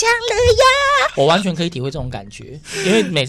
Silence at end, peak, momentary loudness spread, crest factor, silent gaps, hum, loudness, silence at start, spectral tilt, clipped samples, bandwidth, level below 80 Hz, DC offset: 0 s; -4 dBFS; 18 LU; 12 dB; none; none; -15 LUFS; 0 s; -4 dB/octave; under 0.1%; 15.5 kHz; -36 dBFS; under 0.1%